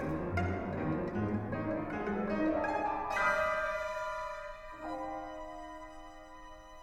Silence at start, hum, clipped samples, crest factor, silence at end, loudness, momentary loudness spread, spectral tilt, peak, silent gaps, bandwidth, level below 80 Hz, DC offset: 0 s; none; under 0.1%; 16 dB; 0 s; -35 LUFS; 18 LU; -7 dB/octave; -18 dBFS; none; 15.5 kHz; -54 dBFS; under 0.1%